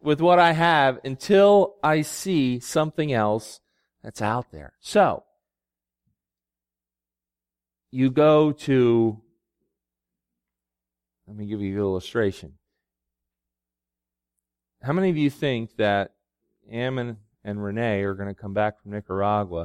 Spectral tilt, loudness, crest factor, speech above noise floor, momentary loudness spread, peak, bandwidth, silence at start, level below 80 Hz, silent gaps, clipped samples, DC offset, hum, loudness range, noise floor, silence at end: -6 dB/octave; -22 LUFS; 20 dB; over 68 dB; 18 LU; -4 dBFS; 16 kHz; 0.05 s; -60 dBFS; none; under 0.1%; under 0.1%; none; 9 LU; under -90 dBFS; 0 s